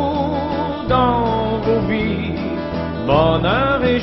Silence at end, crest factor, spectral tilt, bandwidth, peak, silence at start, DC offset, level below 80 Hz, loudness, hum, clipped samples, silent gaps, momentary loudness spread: 0 s; 16 dB; -9 dB/octave; 6 kHz; -2 dBFS; 0 s; under 0.1%; -32 dBFS; -18 LUFS; none; under 0.1%; none; 7 LU